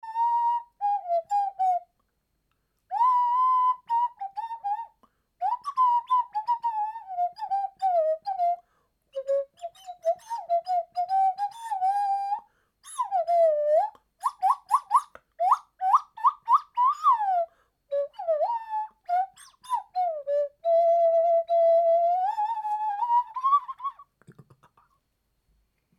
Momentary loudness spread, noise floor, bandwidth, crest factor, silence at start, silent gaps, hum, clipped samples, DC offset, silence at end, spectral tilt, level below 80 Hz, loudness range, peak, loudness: 12 LU; -75 dBFS; 12.5 kHz; 16 dB; 0.05 s; none; none; under 0.1%; under 0.1%; 1.7 s; -2 dB/octave; -78 dBFS; 6 LU; -10 dBFS; -26 LUFS